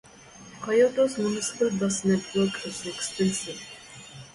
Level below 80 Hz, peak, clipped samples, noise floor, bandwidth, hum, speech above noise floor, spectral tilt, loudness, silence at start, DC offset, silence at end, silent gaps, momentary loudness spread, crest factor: -62 dBFS; -10 dBFS; under 0.1%; -48 dBFS; 11.5 kHz; none; 23 dB; -4.5 dB/octave; -26 LUFS; 0.2 s; under 0.1%; 0.05 s; none; 20 LU; 16 dB